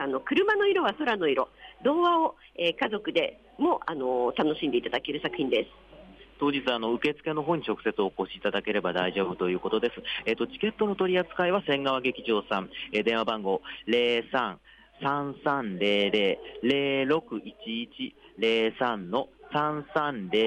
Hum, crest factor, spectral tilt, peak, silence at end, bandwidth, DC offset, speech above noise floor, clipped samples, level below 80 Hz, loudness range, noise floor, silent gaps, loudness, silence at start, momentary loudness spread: none; 14 dB; -6 dB/octave; -14 dBFS; 0 s; 9 kHz; under 0.1%; 23 dB; under 0.1%; -62 dBFS; 2 LU; -51 dBFS; none; -28 LUFS; 0 s; 7 LU